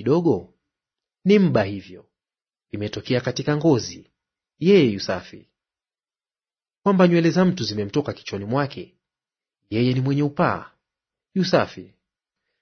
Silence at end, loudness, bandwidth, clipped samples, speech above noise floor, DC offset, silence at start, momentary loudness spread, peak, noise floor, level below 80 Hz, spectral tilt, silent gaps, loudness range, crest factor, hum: 0.75 s; -21 LUFS; 6.6 kHz; under 0.1%; over 70 dB; under 0.1%; 0 s; 14 LU; -4 dBFS; under -90 dBFS; -60 dBFS; -7 dB/octave; none; 3 LU; 20 dB; none